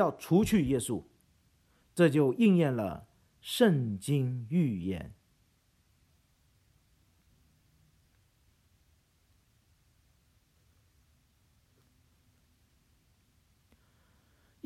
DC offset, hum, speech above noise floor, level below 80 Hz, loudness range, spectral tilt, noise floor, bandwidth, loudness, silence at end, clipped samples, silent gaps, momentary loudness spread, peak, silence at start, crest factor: under 0.1%; none; 42 dB; -60 dBFS; 10 LU; -6.5 dB/octave; -70 dBFS; 14.5 kHz; -29 LUFS; 9.55 s; under 0.1%; none; 15 LU; -12 dBFS; 0 s; 22 dB